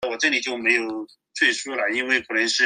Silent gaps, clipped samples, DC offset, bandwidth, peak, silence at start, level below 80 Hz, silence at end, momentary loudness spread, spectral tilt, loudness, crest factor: none; under 0.1%; under 0.1%; 10.5 kHz; -6 dBFS; 0 s; -68 dBFS; 0 s; 9 LU; -0.5 dB/octave; -21 LUFS; 18 dB